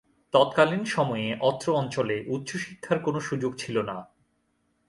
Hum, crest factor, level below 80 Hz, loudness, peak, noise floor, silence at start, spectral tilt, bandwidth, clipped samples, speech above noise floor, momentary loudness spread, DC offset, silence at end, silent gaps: none; 20 dB; -66 dBFS; -27 LUFS; -6 dBFS; -72 dBFS; 0.35 s; -5.5 dB/octave; 11.5 kHz; under 0.1%; 46 dB; 10 LU; under 0.1%; 0.85 s; none